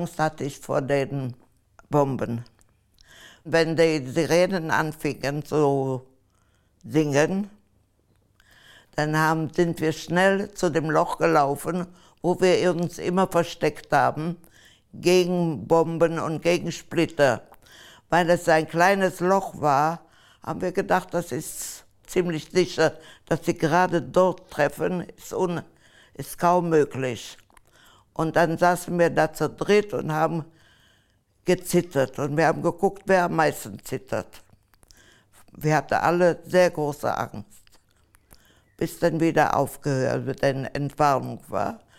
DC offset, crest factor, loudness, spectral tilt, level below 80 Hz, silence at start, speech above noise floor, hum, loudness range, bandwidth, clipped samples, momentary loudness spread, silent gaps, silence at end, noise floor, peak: under 0.1%; 18 dB; -24 LUFS; -5.5 dB/octave; -54 dBFS; 0 s; 41 dB; none; 4 LU; 16.5 kHz; under 0.1%; 11 LU; none; 0.2 s; -64 dBFS; -6 dBFS